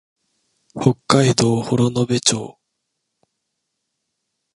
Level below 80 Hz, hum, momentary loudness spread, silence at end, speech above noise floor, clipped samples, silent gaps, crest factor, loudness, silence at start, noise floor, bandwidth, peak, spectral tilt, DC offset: -54 dBFS; none; 11 LU; 2.05 s; 59 dB; under 0.1%; none; 20 dB; -18 LUFS; 0.75 s; -76 dBFS; 11.5 kHz; 0 dBFS; -5 dB/octave; under 0.1%